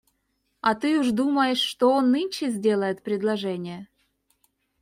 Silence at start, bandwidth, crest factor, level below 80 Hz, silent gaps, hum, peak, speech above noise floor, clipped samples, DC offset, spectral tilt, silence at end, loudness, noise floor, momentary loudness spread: 0.65 s; 16 kHz; 16 dB; -68 dBFS; none; none; -8 dBFS; 50 dB; under 0.1%; under 0.1%; -5 dB/octave; 0.95 s; -24 LUFS; -73 dBFS; 9 LU